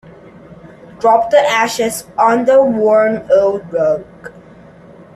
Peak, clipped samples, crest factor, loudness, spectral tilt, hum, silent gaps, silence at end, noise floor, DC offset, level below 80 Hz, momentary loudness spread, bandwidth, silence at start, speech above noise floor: 0 dBFS; under 0.1%; 14 dB; -13 LUFS; -4 dB/octave; none; none; 0.85 s; -40 dBFS; under 0.1%; -54 dBFS; 7 LU; 14 kHz; 0.5 s; 27 dB